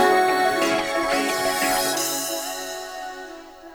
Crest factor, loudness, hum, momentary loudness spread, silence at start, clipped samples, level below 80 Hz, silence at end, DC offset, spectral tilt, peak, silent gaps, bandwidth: 16 dB; -22 LUFS; none; 15 LU; 0 s; under 0.1%; -54 dBFS; 0 s; under 0.1%; -1.5 dB/octave; -6 dBFS; none; over 20 kHz